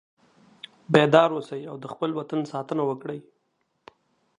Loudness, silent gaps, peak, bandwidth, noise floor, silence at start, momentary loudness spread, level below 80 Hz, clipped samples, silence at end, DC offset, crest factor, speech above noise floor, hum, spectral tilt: -24 LUFS; none; 0 dBFS; 10.5 kHz; -73 dBFS; 0.9 s; 23 LU; -68 dBFS; under 0.1%; 1.2 s; under 0.1%; 26 dB; 50 dB; none; -6.5 dB/octave